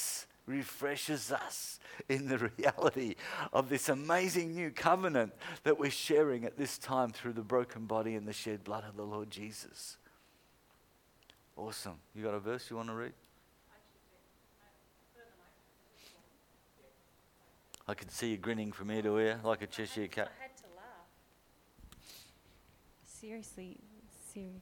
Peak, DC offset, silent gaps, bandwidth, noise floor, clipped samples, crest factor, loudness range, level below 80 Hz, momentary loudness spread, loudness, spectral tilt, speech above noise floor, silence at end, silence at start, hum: -12 dBFS; under 0.1%; none; 19 kHz; -68 dBFS; under 0.1%; 26 dB; 18 LU; -72 dBFS; 21 LU; -36 LUFS; -4 dB/octave; 32 dB; 0 s; 0 s; none